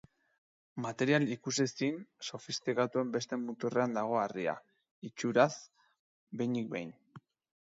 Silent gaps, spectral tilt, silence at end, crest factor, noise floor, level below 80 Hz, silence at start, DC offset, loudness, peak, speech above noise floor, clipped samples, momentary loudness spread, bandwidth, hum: 4.91-5.02 s, 5.99-6.27 s; -5 dB/octave; 0.45 s; 22 dB; -59 dBFS; -80 dBFS; 0.75 s; under 0.1%; -34 LUFS; -12 dBFS; 25 dB; under 0.1%; 16 LU; 7.8 kHz; none